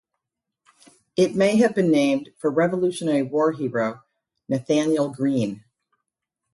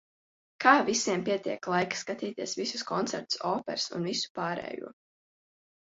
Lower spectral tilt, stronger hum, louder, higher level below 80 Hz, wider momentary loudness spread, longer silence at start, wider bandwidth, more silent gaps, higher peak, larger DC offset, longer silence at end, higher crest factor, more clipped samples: first, -6 dB/octave vs -3 dB/octave; neither; first, -22 LUFS vs -29 LUFS; first, -66 dBFS vs -74 dBFS; about the same, 10 LU vs 12 LU; first, 1.15 s vs 0.6 s; first, 11.5 kHz vs 8 kHz; second, none vs 4.30-4.35 s; about the same, -6 dBFS vs -6 dBFS; neither; about the same, 0.95 s vs 0.95 s; second, 16 dB vs 26 dB; neither